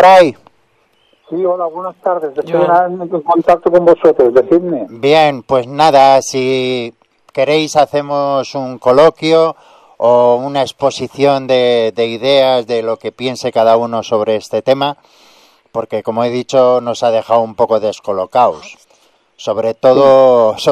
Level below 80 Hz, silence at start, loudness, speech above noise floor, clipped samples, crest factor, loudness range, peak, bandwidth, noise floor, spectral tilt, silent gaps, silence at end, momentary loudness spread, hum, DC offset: -54 dBFS; 0 s; -12 LUFS; 45 dB; 0.2%; 12 dB; 5 LU; 0 dBFS; 13 kHz; -56 dBFS; -5 dB/octave; none; 0 s; 11 LU; none; under 0.1%